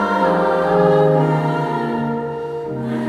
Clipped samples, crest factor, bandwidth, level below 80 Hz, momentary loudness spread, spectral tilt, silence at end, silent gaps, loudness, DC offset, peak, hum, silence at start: under 0.1%; 14 dB; 11.5 kHz; -52 dBFS; 11 LU; -8 dB/octave; 0 s; none; -18 LUFS; under 0.1%; -2 dBFS; none; 0 s